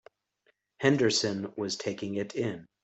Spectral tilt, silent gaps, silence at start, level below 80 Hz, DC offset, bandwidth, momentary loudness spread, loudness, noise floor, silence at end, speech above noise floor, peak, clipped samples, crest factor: -4.5 dB/octave; none; 0.8 s; -70 dBFS; under 0.1%; 8.4 kHz; 9 LU; -30 LUFS; -72 dBFS; 0.2 s; 43 dB; -8 dBFS; under 0.1%; 22 dB